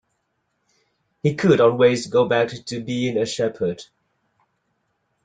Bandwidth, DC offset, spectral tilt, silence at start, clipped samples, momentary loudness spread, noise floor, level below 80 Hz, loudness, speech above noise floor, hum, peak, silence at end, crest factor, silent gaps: 9.4 kHz; under 0.1%; -6 dB/octave; 1.25 s; under 0.1%; 11 LU; -72 dBFS; -60 dBFS; -20 LUFS; 53 dB; none; -2 dBFS; 1.4 s; 20 dB; none